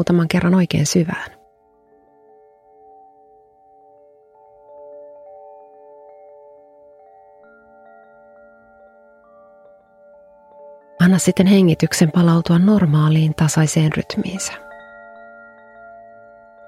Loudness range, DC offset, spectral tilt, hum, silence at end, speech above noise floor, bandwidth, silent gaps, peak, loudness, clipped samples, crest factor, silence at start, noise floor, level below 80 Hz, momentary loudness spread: 9 LU; under 0.1%; -6 dB/octave; none; 1.9 s; 40 dB; 15 kHz; none; 0 dBFS; -16 LUFS; under 0.1%; 20 dB; 0 s; -55 dBFS; -52 dBFS; 27 LU